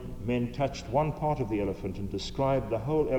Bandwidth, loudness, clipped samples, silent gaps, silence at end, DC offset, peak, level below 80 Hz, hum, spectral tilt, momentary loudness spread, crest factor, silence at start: 19.5 kHz; -31 LUFS; under 0.1%; none; 0 s; under 0.1%; -14 dBFS; -44 dBFS; none; -7 dB/octave; 7 LU; 16 dB; 0 s